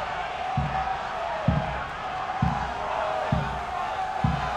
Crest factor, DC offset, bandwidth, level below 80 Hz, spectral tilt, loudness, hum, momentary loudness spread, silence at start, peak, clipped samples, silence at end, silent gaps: 18 dB; under 0.1%; 10.5 kHz; -40 dBFS; -6.5 dB/octave; -28 LUFS; none; 4 LU; 0 s; -10 dBFS; under 0.1%; 0 s; none